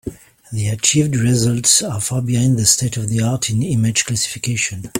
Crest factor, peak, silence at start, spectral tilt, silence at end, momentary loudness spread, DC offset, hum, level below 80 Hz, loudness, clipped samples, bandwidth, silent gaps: 18 dB; 0 dBFS; 0.05 s; -3.5 dB/octave; 0 s; 7 LU; under 0.1%; none; -46 dBFS; -16 LUFS; under 0.1%; 16.5 kHz; none